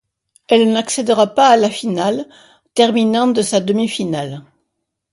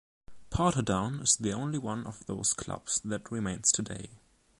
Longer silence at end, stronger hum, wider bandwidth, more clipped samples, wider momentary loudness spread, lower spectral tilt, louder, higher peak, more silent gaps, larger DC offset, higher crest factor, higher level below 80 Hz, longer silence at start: first, 0.7 s vs 0.45 s; neither; about the same, 11.5 kHz vs 11.5 kHz; neither; about the same, 12 LU vs 12 LU; about the same, -4.5 dB/octave vs -3.5 dB/octave; first, -15 LUFS vs -30 LUFS; first, 0 dBFS vs -10 dBFS; neither; neither; second, 16 dB vs 22 dB; second, -62 dBFS vs -52 dBFS; first, 0.5 s vs 0.3 s